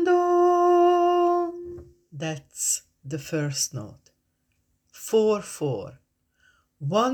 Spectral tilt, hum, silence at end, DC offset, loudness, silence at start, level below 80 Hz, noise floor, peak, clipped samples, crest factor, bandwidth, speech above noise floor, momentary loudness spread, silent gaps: -4.5 dB/octave; none; 0 s; under 0.1%; -23 LUFS; 0 s; -64 dBFS; -72 dBFS; -10 dBFS; under 0.1%; 16 dB; 18.5 kHz; 46 dB; 20 LU; none